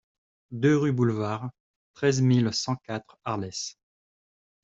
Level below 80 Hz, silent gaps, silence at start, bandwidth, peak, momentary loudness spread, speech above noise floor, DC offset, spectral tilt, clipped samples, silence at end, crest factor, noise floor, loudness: -64 dBFS; 1.60-1.94 s; 0.5 s; 8 kHz; -10 dBFS; 14 LU; over 65 dB; under 0.1%; -6 dB/octave; under 0.1%; 0.9 s; 18 dB; under -90 dBFS; -26 LUFS